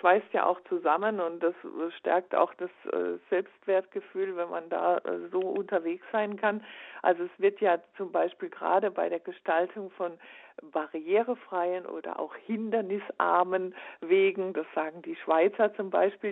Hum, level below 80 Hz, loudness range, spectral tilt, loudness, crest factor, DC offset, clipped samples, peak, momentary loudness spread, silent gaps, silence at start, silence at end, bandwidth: none; -86 dBFS; 3 LU; -8.5 dB/octave; -30 LUFS; 20 dB; under 0.1%; under 0.1%; -10 dBFS; 11 LU; none; 0.05 s; 0 s; 4 kHz